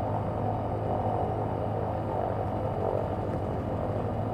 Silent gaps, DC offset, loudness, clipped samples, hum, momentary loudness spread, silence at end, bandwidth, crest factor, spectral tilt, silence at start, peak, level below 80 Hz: none; under 0.1%; -31 LUFS; under 0.1%; none; 2 LU; 0 s; 8.8 kHz; 14 dB; -9.5 dB/octave; 0 s; -16 dBFS; -46 dBFS